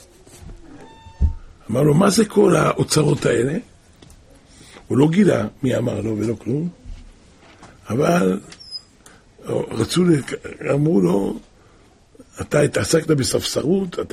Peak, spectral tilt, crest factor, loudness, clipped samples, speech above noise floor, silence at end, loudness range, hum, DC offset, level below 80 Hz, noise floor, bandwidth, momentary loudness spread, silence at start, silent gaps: -2 dBFS; -6 dB/octave; 18 dB; -19 LUFS; under 0.1%; 33 dB; 0.05 s; 5 LU; none; under 0.1%; -38 dBFS; -51 dBFS; 15.5 kHz; 14 LU; 0.35 s; none